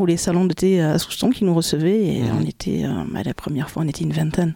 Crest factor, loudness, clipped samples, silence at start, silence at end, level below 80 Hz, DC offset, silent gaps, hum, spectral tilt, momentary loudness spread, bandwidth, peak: 14 dB; -20 LUFS; under 0.1%; 0 s; 0 s; -46 dBFS; under 0.1%; none; none; -6 dB/octave; 7 LU; 17.5 kHz; -6 dBFS